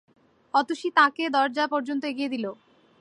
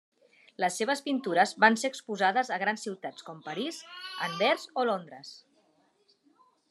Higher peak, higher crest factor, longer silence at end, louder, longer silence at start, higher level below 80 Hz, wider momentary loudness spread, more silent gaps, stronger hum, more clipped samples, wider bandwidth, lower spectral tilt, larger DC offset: about the same, -6 dBFS vs -6 dBFS; about the same, 20 dB vs 24 dB; second, 0.45 s vs 1.3 s; first, -25 LUFS vs -29 LUFS; about the same, 0.55 s vs 0.6 s; first, -82 dBFS vs under -90 dBFS; second, 9 LU vs 17 LU; neither; neither; neither; second, 11 kHz vs 13 kHz; about the same, -3.5 dB/octave vs -3 dB/octave; neither